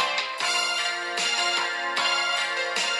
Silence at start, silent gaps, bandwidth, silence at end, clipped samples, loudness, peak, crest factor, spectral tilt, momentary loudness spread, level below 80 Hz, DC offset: 0 s; none; 13.5 kHz; 0 s; under 0.1%; -24 LUFS; -12 dBFS; 14 dB; 1 dB/octave; 3 LU; -86 dBFS; under 0.1%